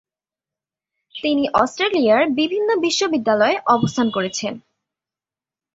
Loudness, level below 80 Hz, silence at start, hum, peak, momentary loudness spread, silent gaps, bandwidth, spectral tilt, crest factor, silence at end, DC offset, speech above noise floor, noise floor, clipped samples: -18 LUFS; -60 dBFS; 1.15 s; none; -2 dBFS; 10 LU; none; 8 kHz; -4 dB/octave; 18 dB; 1.15 s; under 0.1%; over 72 dB; under -90 dBFS; under 0.1%